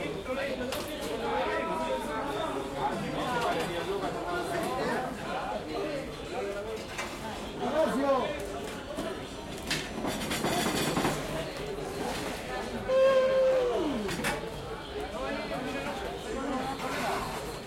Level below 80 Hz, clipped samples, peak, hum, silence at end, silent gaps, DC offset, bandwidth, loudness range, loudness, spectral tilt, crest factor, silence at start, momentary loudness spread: -50 dBFS; under 0.1%; -14 dBFS; none; 0 s; none; under 0.1%; 16.5 kHz; 5 LU; -32 LUFS; -4 dB/octave; 16 dB; 0 s; 9 LU